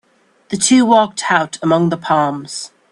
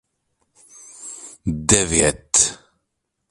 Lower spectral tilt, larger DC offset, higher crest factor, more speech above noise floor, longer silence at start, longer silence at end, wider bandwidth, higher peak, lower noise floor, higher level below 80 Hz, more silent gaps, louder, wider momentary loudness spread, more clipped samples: first, -4 dB/octave vs -2.5 dB/octave; neither; second, 16 dB vs 24 dB; second, 35 dB vs 58 dB; second, 0.5 s vs 1 s; second, 0.25 s vs 0.75 s; second, 11.5 kHz vs 15.5 kHz; about the same, 0 dBFS vs 0 dBFS; second, -49 dBFS vs -76 dBFS; second, -60 dBFS vs -40 dBFS; neither; first, -14 LUFS vs -17 LUFS; second, 15 LU vs 20 LU; neither